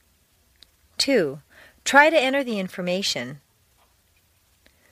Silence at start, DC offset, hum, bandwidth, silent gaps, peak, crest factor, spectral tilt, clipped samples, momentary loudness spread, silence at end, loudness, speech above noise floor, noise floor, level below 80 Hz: 1 s; under 0.1%; none; 15.5 kHz; none; -2 dBFS; 24 dB; -3 dB/octave; under 0.1%; 18 LU; 1.55 s; -21 LUFS; 42 dB; -63 dBFS; -64 dBFS